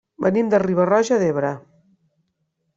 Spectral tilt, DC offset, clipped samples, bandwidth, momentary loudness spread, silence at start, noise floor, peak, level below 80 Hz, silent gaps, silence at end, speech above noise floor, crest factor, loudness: -6.5 dB/octave; under 0.1%; under 0.1%; 8 kHz; 8 LU; 0.2 s; -72 dBFS; -4 dBFS; -62 dBFS; none; 1.15 s; 54 dB; 18 dB; -19 LUFS